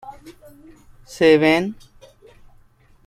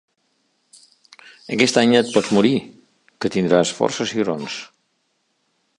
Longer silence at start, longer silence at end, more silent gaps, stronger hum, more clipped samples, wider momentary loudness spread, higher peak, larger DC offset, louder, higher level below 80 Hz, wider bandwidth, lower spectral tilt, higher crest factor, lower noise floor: second, 0.05 s vs 1.5 s; first, 1.35 s vs 1.15 s; neither; neither; neither; first, 27 LU vs 12 LU; about the same, -2 dBFS vs -2 dBFS; neither; about the same, -17 LUFS vs -19 LUFS; first, -54 dBFS vs -62 dBFS; first, 13.5 kHz vs 11.5 kHz; about the same, -5.5 dB/octave vs -4.5 dB/octave; about the same, 20 dB vs 20 dB; second, -52 dBFS vs -69 dBFS